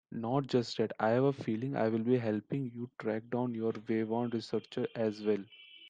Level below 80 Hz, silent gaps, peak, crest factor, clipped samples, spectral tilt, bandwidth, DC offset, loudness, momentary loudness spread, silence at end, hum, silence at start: -76 dBFS; none; -16 dBFS; 18 dB; under 0.1%; -7.5 dB/octave; 9 kHz; under 0.1%; -34 LUFS; 7 LU; 0 s; none; 0.1 s